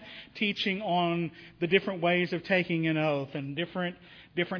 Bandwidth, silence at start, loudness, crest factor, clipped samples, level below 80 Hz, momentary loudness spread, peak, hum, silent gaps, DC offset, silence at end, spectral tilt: 5.4 kHz; 0 s; -29 LUFS; 22 dB; under 0.1%; -68 dBFS; 9 LU; -8 dBFS; none; none; under 0.1%; 0 s; -7 dB/octave